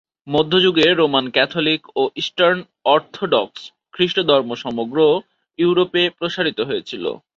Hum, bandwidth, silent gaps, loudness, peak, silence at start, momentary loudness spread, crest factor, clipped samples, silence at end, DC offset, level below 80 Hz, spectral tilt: none; 7.6 kHz; none; -18 LUFS; -2 dBFS; 0.25 s; 9 LU; 16 dB; under 0.1%; 0.2 s; under 0.1%; -60 dBFS; -5.5 dB/octave